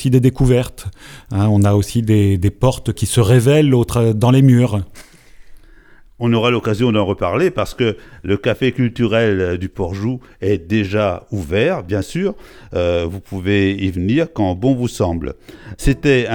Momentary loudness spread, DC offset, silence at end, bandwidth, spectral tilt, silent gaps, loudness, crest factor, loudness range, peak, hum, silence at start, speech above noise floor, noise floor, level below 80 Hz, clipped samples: 11 LU; under 0.1%; 0 s; 17.5 kHz; -6.5 dB/octave; none; -16 LUFS; 16 dB; 5 LU; 0 dBFS; none; 0 s; 28 dB; -44 dBFS; -34 dBFS; under 0.1%